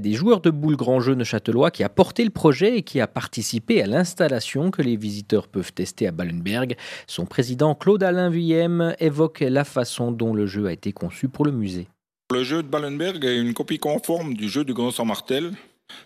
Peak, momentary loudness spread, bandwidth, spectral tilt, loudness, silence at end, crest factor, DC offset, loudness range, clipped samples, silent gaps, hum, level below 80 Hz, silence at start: 0 dBFS; 8 LU; 15 kHz; -6 dB/octave; -22 LUFS; 0.05 s; 22 dB; under 0.1%; 5 LU; under 0.1%; none; none; -62 dBFS; 0 s